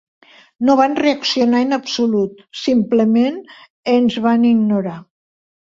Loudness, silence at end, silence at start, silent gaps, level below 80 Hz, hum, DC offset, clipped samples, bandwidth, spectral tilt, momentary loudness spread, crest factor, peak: -16 LUFS; 0.75 s; 0.6 s; 3.70-3.83 s; -60 dBFS; none; under 0.1%; under 0.1%; 7.6 kHz; -5.5 dB/octave; 10 LU; 14 dB; -2 dBFS